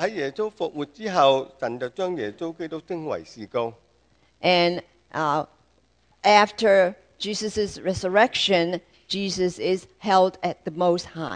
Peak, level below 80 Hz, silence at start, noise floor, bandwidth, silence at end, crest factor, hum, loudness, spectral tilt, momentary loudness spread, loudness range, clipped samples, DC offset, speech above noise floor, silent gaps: -2 dBFS; -58 dBFS; 0 s; -63 dBFS; 9.8 kHz; 0 s; 22 dB; none; -23 LUFS; -4.5 dB/octave; 13 LU; 5 LU; under 0.1%; under 0.1%; 40 dB; none